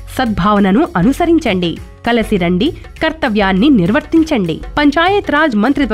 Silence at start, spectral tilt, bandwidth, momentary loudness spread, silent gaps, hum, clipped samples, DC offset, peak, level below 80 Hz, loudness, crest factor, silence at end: 0 s; -6.5 dB/octave; 14.5 kHz; 7 LU; none; none; under 0.1%; 0.3%; -2 dBFS; -32 dBFS; -13 LUFS; 10 dB; 0 s